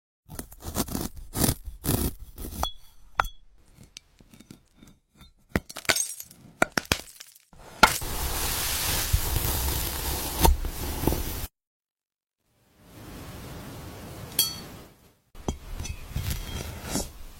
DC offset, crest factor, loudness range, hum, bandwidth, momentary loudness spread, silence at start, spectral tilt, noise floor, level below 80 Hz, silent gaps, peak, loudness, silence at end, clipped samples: under 0.1%; 28 dB; 10 LU; none; 16.5 kHz; 19 LU; 0.3 s; -3 dB/octave; under -90 dBFS; -36 dBFS; 11.67-11.83 s, 11.91-11.95 s; -4 dBFS; -28 LUFS; 0 s; under 0.1%